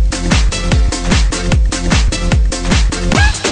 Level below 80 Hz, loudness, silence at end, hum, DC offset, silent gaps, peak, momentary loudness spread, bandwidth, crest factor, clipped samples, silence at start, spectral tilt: -14 dBFS; -14 LUFS; 0 s; none; under 0.1%; none; 0 dBFS; 2 LU; 10.5 kHz; 10 dB; under 0.1%; 0 s; -4.5 dB/octave